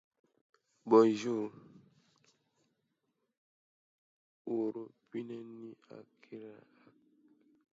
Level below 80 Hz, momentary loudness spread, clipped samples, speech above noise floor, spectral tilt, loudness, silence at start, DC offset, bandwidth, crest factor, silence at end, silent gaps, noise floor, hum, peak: -90 dBFS; 27 LU; under 0.1%; 50 dB; -6 dB/octave; -32 LUFS; 0.85 s; under 0.1%; 7.6 kHz; 24 dB; 1.2 s; 3.37-4.45 s; -83 dBFS; none; -14 dBFS